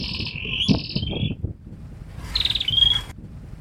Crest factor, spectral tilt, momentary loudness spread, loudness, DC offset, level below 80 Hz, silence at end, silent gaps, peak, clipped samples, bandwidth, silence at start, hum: 20 dB; -4.5 dB/octave; 23 LU; -21 LUFS; under 0.1%; -38 dBFS; 0 s; none; -4 dBFS; under 0.1%; 19 kHz; 0 s; none